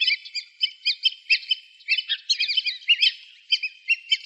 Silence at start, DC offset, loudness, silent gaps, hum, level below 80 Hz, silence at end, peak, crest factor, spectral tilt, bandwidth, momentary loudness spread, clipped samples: 0 s; under 0.1%; -22 LUFS; none; none; under -90 dBFS; 0.05 s; -6 dBFS; 18 dB; 13 dB/octave; 8.8 kHz; 8 LU; under 0.1%